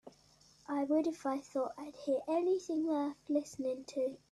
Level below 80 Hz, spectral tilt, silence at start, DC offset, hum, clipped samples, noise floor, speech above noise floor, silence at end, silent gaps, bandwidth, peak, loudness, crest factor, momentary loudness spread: -78 dBFS; -5 dB/octave; 0.05 s; under 0.1%; none; under 0.1%; -65 dBFS; 30 dB; 0.15 s; none; 12 kHz; -22 dBFS; -36 LUFS; 14 dB; 7 LU